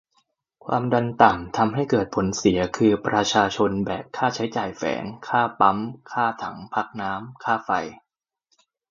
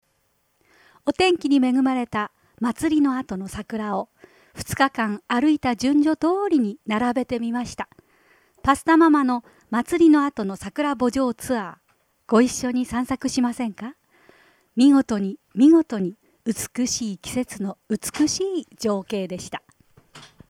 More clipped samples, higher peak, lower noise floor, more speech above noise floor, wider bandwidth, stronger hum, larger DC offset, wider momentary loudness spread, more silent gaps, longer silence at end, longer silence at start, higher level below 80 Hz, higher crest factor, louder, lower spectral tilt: neither; first, 0 dBFS vs -4 dBFS; about the same, -71 dBFS vs -68 dBFS; about the same, 49 dB vs 47 dB; second, 7.6 kHz vs 15.5 kHz; neither; neither; second, 11 LU vs 14 LU; neither; first, 0.95 s vs 0.25 s; second, 0.65 s vs 1.05 s; about the same, -52 dBFS vs -54 dBFS; about the same, 24 dB vs 20 dB; about the same, -23 LUFS vs -22 LUFS; about the same, -5 dB/octave vs -4.5 dB/octave